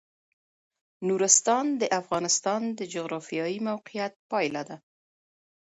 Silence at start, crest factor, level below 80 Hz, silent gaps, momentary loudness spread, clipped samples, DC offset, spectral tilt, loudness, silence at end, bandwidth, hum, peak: 1 s; 26 dB; -74 dBFS; 4.16-4.29 s; 14 LU; under 0.1%; under 0.1%; -2.5 dB/octave; -26 LUFS; 1 s; 11.5 kHz; none; -4 dBFS